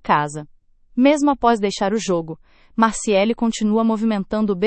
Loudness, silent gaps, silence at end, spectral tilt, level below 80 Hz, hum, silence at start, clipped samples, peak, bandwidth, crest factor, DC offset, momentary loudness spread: -19 LUFS; none; 0 s; -5 dB/octave; -48 dBFS; none; 0.05 s; under 0.1%; -2 dBFS; 8.8 kHz; 18 dB; under 0.1%; 12 LU